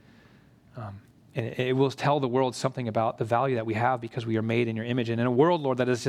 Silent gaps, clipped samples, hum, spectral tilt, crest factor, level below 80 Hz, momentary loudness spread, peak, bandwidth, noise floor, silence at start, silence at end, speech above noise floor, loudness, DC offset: none; under 0.1%; none; -6.5 dB/octave; 18 dB; -68 dBFS; 12 LU; -8 dBFS; 13 kHz; -56 dBFS; 0.75 s; 0 s; 30 dB; -27 LUFS; under 0.1%